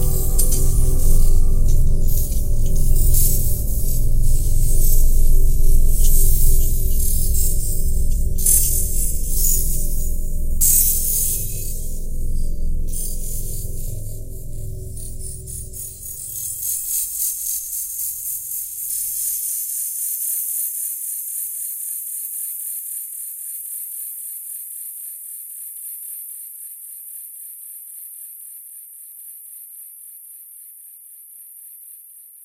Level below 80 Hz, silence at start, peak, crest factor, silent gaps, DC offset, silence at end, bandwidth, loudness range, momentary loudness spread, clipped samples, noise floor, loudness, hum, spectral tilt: -18 dBFS; 0 s; 0 dBFS; 16 dB; none; under 0.1%; 0 s; 16 kHz; 14 LU; 17 LU; under 0.1%; -43 dBFS; -22 LUFS; none; -4 dB/octave